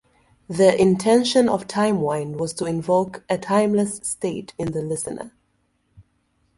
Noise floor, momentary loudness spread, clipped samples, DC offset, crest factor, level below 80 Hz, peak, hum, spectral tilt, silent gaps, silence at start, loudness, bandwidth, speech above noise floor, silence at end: -68 dBFS; 12 LU; under 0.1%; under 0.1%; 18 dB; -56 dBFS; -4 dBFS; none; -5 dB/octave; none; 0.5 s; -21 LUFS; 11.5 kHz; 47 dB; 0.55 s